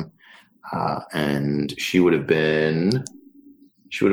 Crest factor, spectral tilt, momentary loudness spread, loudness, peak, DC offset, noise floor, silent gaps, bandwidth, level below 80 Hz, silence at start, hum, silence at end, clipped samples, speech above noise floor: 16 dB; -6 dB/octave; 14 LU; -22 LUFS; -6 dBFS; under 0.1%; -52 dBFS; none; 16.5 kHz; -54 dBFS; 0 s; none; 0 s; under 0.1%; 31 dB